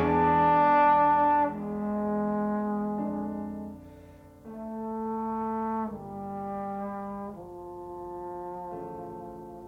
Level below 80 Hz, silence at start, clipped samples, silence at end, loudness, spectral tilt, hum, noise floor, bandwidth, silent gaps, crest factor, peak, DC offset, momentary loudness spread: -58 dBFS; 0 s; under 0.1%; 0 s; -28 LUFS; -8.5 dB/octave; none; -50 dBFS; 5.6 kHz; none; 16 dB; -12 dBFS; under 0.1%; 20 LU